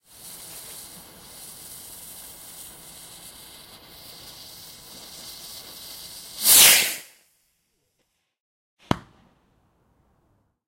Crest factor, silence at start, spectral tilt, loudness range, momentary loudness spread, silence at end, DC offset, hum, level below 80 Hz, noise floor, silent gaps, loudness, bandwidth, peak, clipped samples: 28 dB; 0.55 s; 0 dB/octave; 21 LU; 28 LU; 1.7 s; under 0.1%; none; -58 dBFS; -74 dBFS; 8.40-8.77 s; -15 LUFS; 16.5 kHz; 0 dBFS; under 0.1%